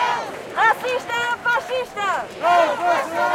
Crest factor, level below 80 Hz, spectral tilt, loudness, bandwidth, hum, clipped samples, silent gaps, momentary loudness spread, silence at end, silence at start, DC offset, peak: 16 dB; -62 dBFS; -2.5 dB/octave; -20 LUFS; 16.5 kHz; none; under 0.1%; none; 7 LU; 0 s; 0 s; under 0.1%; -6 dBFS